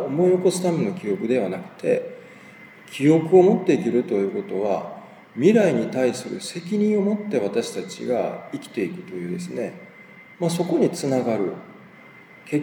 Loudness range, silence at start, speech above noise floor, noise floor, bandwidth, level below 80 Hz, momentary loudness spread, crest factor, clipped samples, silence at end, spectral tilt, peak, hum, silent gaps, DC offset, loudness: 6 LU; 0 s; 25 dB; -47 dBFS; 19 kHz; -76 dBFS; 14 LU; 20 dB; under 0.1%; 0 s; -6.5 dB/octave; -2 dBFS; none; none; under 0.1%; -22 LUFS